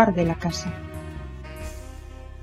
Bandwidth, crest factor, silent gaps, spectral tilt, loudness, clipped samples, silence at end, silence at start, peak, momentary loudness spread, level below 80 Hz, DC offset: 14 kHz; 26 dB; none; -6 dB/octave; -29 LUFS; under 0.1%; 0 s; 0 s; -2 dBFS; 17 LU; -40 dBFS; under 0.1%